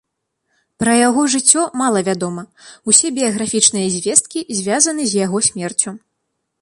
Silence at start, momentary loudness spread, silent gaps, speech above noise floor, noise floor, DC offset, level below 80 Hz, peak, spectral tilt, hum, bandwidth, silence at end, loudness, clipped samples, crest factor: 0.8 s; 10 LU; none; 57 dB; -73 dBFS; under 0.1%; -58 dBFS; 0 dBFS; -2.5 dB/octave; none; 14.5 kHz; 0.65 s; -15 LUFS; under 0.1%; 18 dB